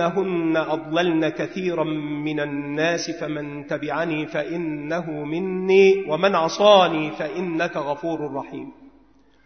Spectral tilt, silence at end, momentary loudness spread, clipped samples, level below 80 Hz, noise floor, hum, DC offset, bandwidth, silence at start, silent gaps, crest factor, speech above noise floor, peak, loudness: -5.5 dB/octave; 0.55 s; 13 LU; under 0.1%; -64 dBFS; -56 dBFS; none; 0.1%; 6.6 kHz; 0 s; none; 20 dB; 34 dB; -2 dBFS; -22 LUFS